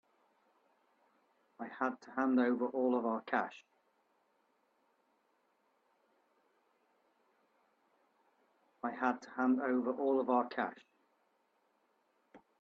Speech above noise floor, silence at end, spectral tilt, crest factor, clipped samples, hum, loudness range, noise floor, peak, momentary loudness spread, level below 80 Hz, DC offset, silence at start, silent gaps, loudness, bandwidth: 43 dB; 0.2 s; -6.5 dB/octave; 22 dB; under 0.1%; none; 8 LU; -77 dBFS; -18 dBFS; 11 LU; -88 dBFS; under 0.1%; 1.6 s; none; -35 LUFS; 6.8 kHz